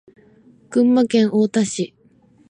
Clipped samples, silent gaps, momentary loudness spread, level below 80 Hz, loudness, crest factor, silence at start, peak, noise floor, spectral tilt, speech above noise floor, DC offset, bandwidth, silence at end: under 0.1%; none; 10 LU; -68 dBFS; -18 LUFS; 14 dB; 0.7 s; -6 dBFS; -54 dBFS; -5.5 dB/octave; 37 dB; under 0.1%; 10 kHz; 0.65 s